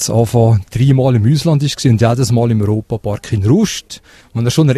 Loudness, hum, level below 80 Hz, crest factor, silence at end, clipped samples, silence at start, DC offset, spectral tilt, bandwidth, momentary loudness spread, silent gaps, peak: -13 LUFS; none; -40 dBFS; 12 dB; 0 s; under 0.1%; 0 s; under 0.1%; -6.5 dB/octave; 13.5 kHz; 9 LU; none; 0 dBFS